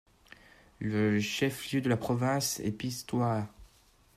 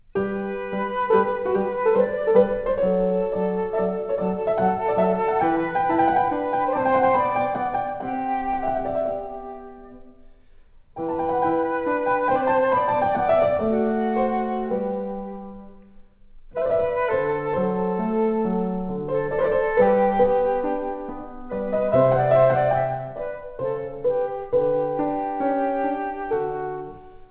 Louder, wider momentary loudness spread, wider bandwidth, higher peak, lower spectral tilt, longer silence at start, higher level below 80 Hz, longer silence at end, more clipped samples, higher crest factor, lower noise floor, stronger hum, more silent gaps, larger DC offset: second, -31 LUFS vs -23 LUFS; second, 7 LU vs 11 LU; first, 15.5 kHz vs 4 kHz; second, -16 dBFS vs -6 dBFS; second, -5 dB/octave vs -11 dB/octave; first, 0.8 s vs 0.15 s; second, -62 dBFS vs -50 dBFS; first, 0.5 s vs 0.05 s; neither; about the same, 16 dB vs 18 dB; first, -63 dBFS vs -49 dBFS; neither; neither; second, under 0.1% vs 0.1%